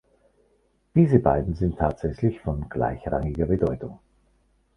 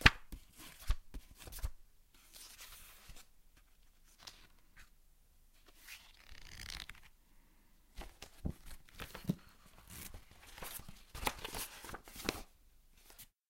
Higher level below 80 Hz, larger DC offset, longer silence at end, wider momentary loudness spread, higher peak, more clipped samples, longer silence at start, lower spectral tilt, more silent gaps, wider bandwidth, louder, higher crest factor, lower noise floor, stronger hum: first, -38 dBFS vs -50 dBFS; neither; first, 0.8 s vs 0.25 s; second, 10 LU vs 20 LU; about the same, -4 dBFS vs -6 dBFS; neither; first, 0.95 s vs 0 s; first, -10.5 dB/octave vs -3.5 dB/octave; neither; second, 6 kHz vs 16.5 kHz; first, -24 LUFS vs -45 LUFS; second, 22 dB vs 38 dB; about the same, -66 dBFS vs -66 dBFS; neither